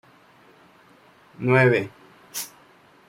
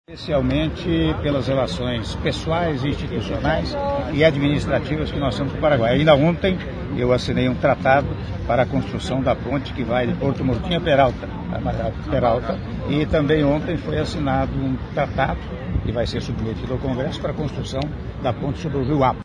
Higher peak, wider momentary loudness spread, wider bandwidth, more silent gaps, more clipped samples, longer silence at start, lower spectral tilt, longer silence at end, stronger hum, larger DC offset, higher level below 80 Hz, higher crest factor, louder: second, -6 dBFS vs 0 dBFS; first, 19 LU vs 9 LU; first, 16 kHz vs 10.5 kHz; neither; neither; first, 1.4 s vs 0.1 s; about the same, -6 dB/octave vs -7 dB/octave; first, 0.6 s vs 0 s; neither; neither; second, -64 dBFS vs -34 dBFS; about the same, 20 dB vs 20 dB; about the same, -22 LUFS vs -21 LUFS